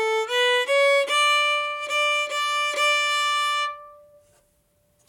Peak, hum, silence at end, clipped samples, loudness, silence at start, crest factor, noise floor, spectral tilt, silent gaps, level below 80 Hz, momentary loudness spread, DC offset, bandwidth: -10 dBFS; none; 1.15 s; under 0.1%; -21 LUFS; 0 s; 12 dB; -65 dBFS; 2.5 dB/octave; none; -74 dBFS; 6 LU; under 0.1%; 18.5 kHz